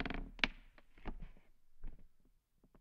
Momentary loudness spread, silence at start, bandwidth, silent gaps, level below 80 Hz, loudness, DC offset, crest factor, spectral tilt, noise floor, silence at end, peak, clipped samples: 22 LU; 0 s; 7.6 kHz; none; -52 dBFS; -42 LUFS; under 0.1%; 34 dB; -4 dB/octave; -71 dBFS; 0 s; -12 dBFS; under 0.1%